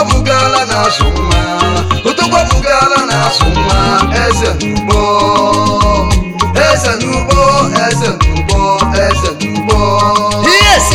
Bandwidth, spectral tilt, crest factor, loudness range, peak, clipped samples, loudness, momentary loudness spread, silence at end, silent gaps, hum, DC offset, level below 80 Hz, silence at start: 16.5 kHz; -4 dB/octave; 10 dB; 1 LU; 0 dBFS; 0.4%; -10 LUFS; 4 LU; 0 s; none; none; 2%; -18 dBFS; 0 s